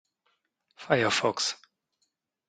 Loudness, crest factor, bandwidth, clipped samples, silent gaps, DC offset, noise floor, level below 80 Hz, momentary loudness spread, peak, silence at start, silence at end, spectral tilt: -27 LUFS; 26 dB; 9.8 kHz; under 0.1%; none; under 0.1%; -78 dBFS; -72 dBFS; 8 LU; -6 dBFS; 0.8 s; 0.95 s; -3 dB/octave